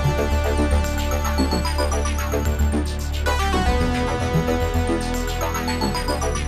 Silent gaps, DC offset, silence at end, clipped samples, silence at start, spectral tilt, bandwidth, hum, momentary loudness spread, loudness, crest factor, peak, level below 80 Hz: none; under 0.1%; 0 s; under 0.1%; 0 s; -5 dB/octave; 14 kHz; none; 3 LU; -22 LUFS; 14 dB; -8 dBFS; -26 dBFS